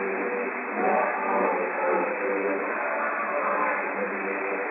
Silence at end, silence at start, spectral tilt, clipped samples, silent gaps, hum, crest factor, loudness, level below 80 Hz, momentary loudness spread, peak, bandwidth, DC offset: 0 s; 0 s; -10 dB/octave; under 0.1%; none; none; 16 dB; -26 LUFS; under -90 dBFS; 4 LU; -12 dBFS; 3.8 kHz; under 0.1%